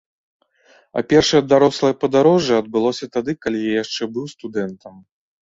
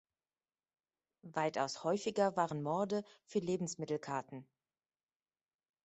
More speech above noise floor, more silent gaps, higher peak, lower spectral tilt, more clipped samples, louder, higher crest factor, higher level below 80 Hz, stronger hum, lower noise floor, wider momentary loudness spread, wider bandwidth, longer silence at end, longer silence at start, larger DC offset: second, 37 dB vs over 53 dB; neither; first, -2 dBFS vs -20 dBFS; about the same, -5 dB/octave vs -5 dB/octave; neither; first, -18 LUFS vs -38 LUFS; about the same, 18 dB vs 20 dB; first, -54 dBFS vs -80 dBFS; neither; second, -55 dBFS vs under -90 dBFS; first, 13 LU vs 9 LU; about the same, 7.8 kHz vs 8.2 kHz; second, 0.45 s vs 1.4 s; second, 0.95 s vs 1.25 s; neither